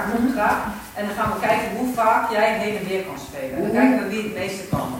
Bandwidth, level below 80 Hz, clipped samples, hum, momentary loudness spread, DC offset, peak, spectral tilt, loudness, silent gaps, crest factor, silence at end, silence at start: 16.5 kHz; -48 dBFS; under 0.1%; none; 10 LU; under 0.1%; -4 dBFS; -5.5 dB/octave; -22 LUFS; none; 18 dB; 0 s; 0 s